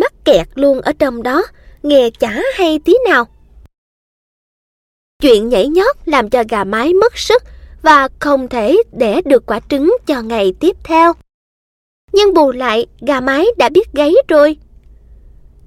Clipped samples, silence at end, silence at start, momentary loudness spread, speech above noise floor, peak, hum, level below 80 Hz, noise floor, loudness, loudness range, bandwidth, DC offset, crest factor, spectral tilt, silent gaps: under 0.1%; 1.15 s; 0 s; 6 LU; 29 dB; 0 dBFS; none; -38 dBFS; -40 dBFS; -12 LUFS; 3 LU; 16 kHz; under 0.1%; 12 dB; -4.5 dB/octave; 3.78-5.20 s, 11.34-12.08 s